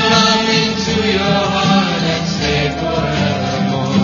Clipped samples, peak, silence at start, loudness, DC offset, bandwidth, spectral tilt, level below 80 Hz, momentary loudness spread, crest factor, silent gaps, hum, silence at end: under 0.1%; 0 dBFS; 0 s; -15 LUFS; under 0.1%; 7.4 kHz; -4.5 dB/octave; -36 dBFS; 6 LU; 14 dB; none; none; 0 s